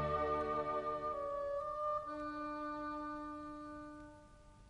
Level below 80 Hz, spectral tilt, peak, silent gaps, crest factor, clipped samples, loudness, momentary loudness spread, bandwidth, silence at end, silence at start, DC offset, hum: -60 dBFS; -7 dB/octave; -26 dBFS; none; 16 dB; under 0.1%; -41 LUFS; 14 LU; 10.5 kHz; 0 s; 0 s; under 0.1%; none